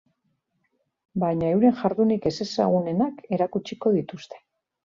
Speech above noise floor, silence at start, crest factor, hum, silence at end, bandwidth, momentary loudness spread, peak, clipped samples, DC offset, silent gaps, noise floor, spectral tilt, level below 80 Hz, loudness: 50 dB; 1.15 s; 16 dB; none; 0.5 s; 7.4 kHz; 11 LU; -8 dBFS; under 0.1%; under 0.1%; none; -74 dBFS; -7.5 dB/octave; -60 dBFS; -24 LUFS